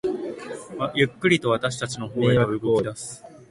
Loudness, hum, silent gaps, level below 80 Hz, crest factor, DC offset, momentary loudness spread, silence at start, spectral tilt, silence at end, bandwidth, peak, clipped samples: -23 LUFS; none; none; -54 dBFS; 18 dB; under 0.1%; 15 LU; 0.05 s; -5.5 dB/octave; 0.05 s; 11.5 kHz; -6 dBFS; under 0.1%